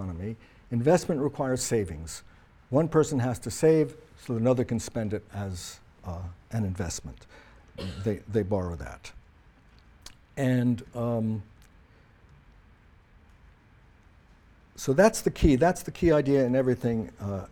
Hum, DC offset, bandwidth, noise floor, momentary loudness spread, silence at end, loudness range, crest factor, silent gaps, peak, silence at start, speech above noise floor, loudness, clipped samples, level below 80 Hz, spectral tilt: none; under 0.1%; 18 kHz; -57 dBFS; 18 LU; 0.05 s; 10 LU; 22 dB; none; -8 dBFS; 0 s; 30 dB; -27 LUFS; under 0.1%; -46 dBFS; -6.5 dB/octave